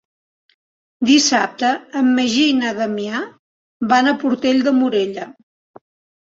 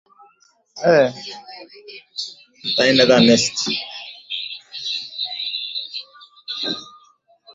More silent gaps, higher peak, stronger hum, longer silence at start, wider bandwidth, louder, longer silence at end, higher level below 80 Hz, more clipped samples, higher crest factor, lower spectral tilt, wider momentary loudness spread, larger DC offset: first, 3.39-3.80 s vs none; about the same, -2 dBFS vs -2 dBFS; neither; first, 1 s vs 0.75 s; about the same, 7.8 kHz vs 8 kHz; about the same, -17 LUFS vs -19 LUFS; first, 0.95 s vs 0.05 s; about the same, -62 dBFS vs -62 dBFS; neither; about the same, 16 dB vs 20 dB; about the same, -3 dB/octave vs -3.5 dB/octave; second, 12 LU vs 21 LU; neither